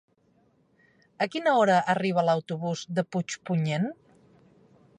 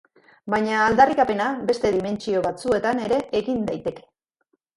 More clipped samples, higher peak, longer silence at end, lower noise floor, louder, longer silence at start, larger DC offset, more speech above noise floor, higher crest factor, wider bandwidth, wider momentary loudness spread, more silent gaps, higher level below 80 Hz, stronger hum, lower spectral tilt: neither; second, -10 dBFS vs -2 dBFS; first, 1.05 s vs 0.75 s; second, -66 dBFS vs -71 dBFS; second, -26 LUFS vs -22 LUFS; first, 1.2 s vs 0.45 s; neither; second, 40 dB vs 50 dB; about the same, 18 dB vs 20 dB; about the same, 10.5 kHz vs 11.5 kHz; about the same, 10 LU vs 10 LU; neither; second, -74 dBFS vs -52 dBFS; neither; about the same, -6 dB/octave vs -5.5 dB/octave